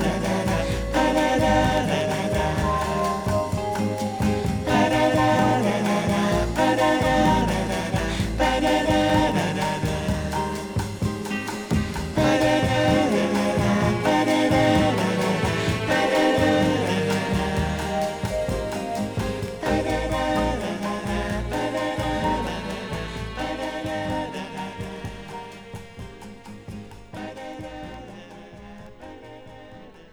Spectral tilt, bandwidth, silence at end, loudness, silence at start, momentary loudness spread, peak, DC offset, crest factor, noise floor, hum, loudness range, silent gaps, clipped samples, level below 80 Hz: -5.5 dB/octave; over 20 kHz; 0.05 s; -23 LUFS; 0 s; 19 LU; -6 dBFS; under 0.1%; 16 dB; -44 dBFS; none; 16 LU; none; under 0.1%; -36 dBFS